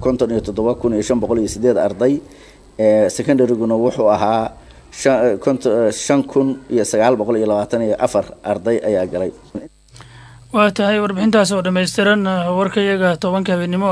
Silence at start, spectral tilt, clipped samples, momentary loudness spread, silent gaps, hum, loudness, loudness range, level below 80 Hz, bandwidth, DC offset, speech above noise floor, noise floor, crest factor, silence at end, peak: 0 s; -5.5 dB/octave; under 0.1%; 7 LU; none; none; -17 LUFS; 3 LU; -46 dBFS; 11 kHz; under 0.1%; 26 dB; -42 dBFS; 16 dB; 0 s; 0 dBFS